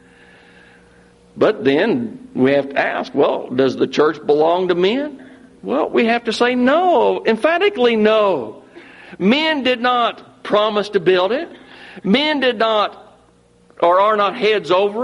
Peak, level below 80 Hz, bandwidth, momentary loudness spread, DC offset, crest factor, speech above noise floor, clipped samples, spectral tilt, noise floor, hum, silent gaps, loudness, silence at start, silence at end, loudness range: -2 dBFS; -60 dBFS; 11 kHz; 9 LU; under 0.1%; 14 dB; 36 dB; under 0.1%; -5.5 dB/octave; -52 dBFS; none; none; -16 LUFS; 1.35 s; 0 s; 2 LU